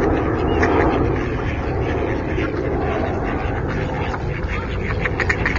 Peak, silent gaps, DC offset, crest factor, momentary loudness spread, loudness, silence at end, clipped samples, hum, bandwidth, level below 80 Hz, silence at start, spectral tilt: -2 dBFS; none; under 0.1%; 18 dB; 7 LU; -21 LUFS; 0 s; under 0.1%; none; 7.4 kHz; -28 dBFS; 0 s; -7.5 dB/octave